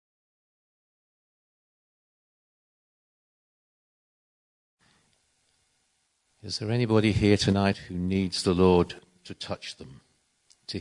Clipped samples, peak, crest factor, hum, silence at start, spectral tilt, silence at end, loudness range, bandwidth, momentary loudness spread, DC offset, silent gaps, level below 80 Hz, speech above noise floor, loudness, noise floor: under 0.1%; -8 dBFS; 22 dB; none; 6.45 s; -6 dB/octave; 0 s; 8 LU; 11 kHz; 22 LU; under 0.1%; none; -56 dBFS; 48 dB; -25 LUFS; -73 dBFS